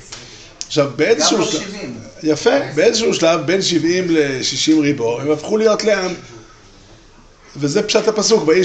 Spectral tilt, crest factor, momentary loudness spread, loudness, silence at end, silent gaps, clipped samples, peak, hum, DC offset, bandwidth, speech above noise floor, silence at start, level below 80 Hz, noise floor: -3.5 dB/octave; 16 dB; 13 LU; -16 LUFS; 0 s; none; under 0.1%; -2 dBFS; none; under 0.1%; 9 kHz; 29 dB; 0 s; -50 dBFS; -45 dBFS